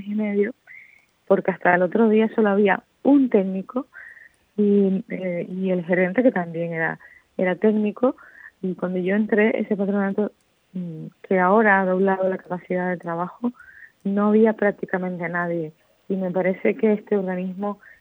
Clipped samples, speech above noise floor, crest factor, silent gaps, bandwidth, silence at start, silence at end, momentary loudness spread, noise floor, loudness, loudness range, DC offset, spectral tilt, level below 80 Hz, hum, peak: under 0.1%; 32 dB; 18 dB; none; 3.9 kHz; 0 s; 0.25 s; 13 LU; -53 dBFS; -22 LUFS; 4 LU; under 0.1%; -10 dB/octave; -74 dBFS; none; -4 dBFS